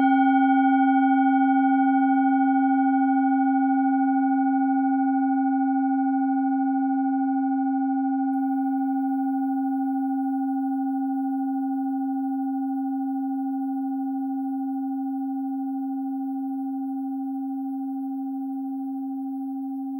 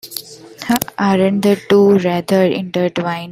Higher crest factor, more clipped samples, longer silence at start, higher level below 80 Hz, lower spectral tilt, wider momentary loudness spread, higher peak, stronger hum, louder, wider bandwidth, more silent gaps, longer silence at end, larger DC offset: about the same, 14 dB vs 16 dB; neither; about the same, 0 s vs 0.05 s; second, under -90 dBFS vs -54 dBFS; about the same, -7 dB/octave vs -6 dB/octave; about the same, 10 LU vs 11 LU; second, -10 dBFS vs 0 dBFS; neither; second, -24 LUFS vs -15 LUFS; second, 3.4 kHz vs 16 kHz; neither; about the same, 0 s vs 0 s; neither